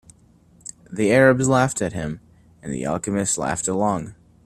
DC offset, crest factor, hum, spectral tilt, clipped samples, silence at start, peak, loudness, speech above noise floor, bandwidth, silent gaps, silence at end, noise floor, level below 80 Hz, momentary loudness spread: under 0.1%; 20 dB; none; -5 dB/octave; under 0.1%; 0.9 s; -2 dBFS; -21 LUFS; 34 dB; 13 kHz; none; 0.3 s; -54 dBFS; -50 dBFS; 23 LU